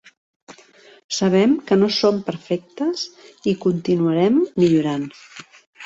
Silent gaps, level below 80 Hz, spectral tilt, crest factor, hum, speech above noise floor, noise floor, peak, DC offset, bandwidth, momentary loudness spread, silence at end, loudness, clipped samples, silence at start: 1.04-1.09 s, 5.66-5.73 s; -60 dBFS; -6 dB/octave; 16 dB; none; 30 dB; -49 dBFS; -6 dBFS; under 0.1%; 8 kHz; 13 LU; 0 s; -19 LUFS; under 0.1%; 0.5 s